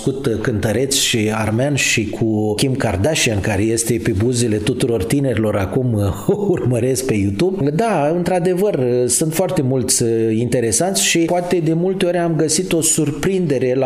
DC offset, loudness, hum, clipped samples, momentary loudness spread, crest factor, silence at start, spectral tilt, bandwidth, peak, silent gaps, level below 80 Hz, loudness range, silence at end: under 0.1%; -17 LUFS; none; under 0.1%; 4 LU; 14 dB; 0 s; -4.5 dB/octave; 16 kHz; -4 dBFS; none; -44 dBFS; 2 LU; 0 s